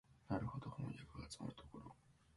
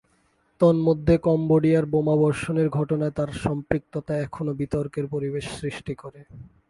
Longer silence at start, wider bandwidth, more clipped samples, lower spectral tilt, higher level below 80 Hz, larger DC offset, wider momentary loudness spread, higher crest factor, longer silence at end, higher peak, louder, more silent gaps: second, 0.1 s vs 0.6 s; about the same, 11.5 kHz vs 11.5 kHz; neither; second, -6.5 dB/octave vs -8 dB/octave; second, -66 dBFS vs -46 dBFS; neither; about the same, 14 LU vs 12 LU; about the same, 20 dB vs 20 dB; second, 0 s vs 0.2 s; second, -30 dBFS vs -4 dBFS; second, -50 LUFS vs -24 LUFS; neither